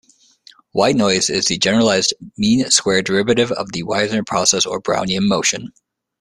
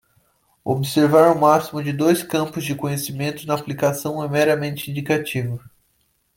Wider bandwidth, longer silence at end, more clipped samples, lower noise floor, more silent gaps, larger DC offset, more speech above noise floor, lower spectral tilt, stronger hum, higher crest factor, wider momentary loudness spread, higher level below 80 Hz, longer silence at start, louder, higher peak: second, 13 kHz vs 17 kHz; second, 0.55 s vs 0.7 s; neither; second, -49 dBFS vs -66 dBFS; neither; neither; second, 32 dB vs 46 dB; second, -3 dB/octave vs -5.5 dB/octave; neither; about the same, 18 dB vs 18 dB; second, 6 LU vs 12 LU; first, -52 dBFS vs -58 dBFS; about the same, 0.75 s vs 0.65 s; first, -16 LUFS vs -20 LUFS; about the same, 0 dBFS vs -2 dBFS